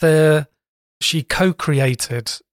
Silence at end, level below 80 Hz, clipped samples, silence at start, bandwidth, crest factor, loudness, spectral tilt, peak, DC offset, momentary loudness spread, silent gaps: 0.15 s; -46 dBFS; under 0.1%; 0 s; 16.5 kHz; 12 dB; -18 LUFS; -5 dB/octave; -6 dBFS; under 0.1%; 9 LU; 0.68-1.01 s